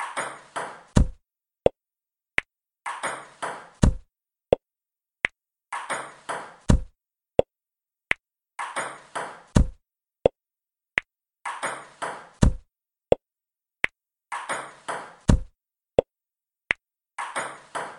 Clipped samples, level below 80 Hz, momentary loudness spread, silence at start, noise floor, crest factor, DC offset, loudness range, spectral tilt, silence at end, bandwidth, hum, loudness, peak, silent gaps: under 0.1%; -34 dBFS; 11 LU; 0 s; under -90 dBFS; 26 dB; under 0.1%; 1 LU; -5.5 dB/octave; 0 s; 11.5 kHz; none; -28 LUFS; -2 dBFS; none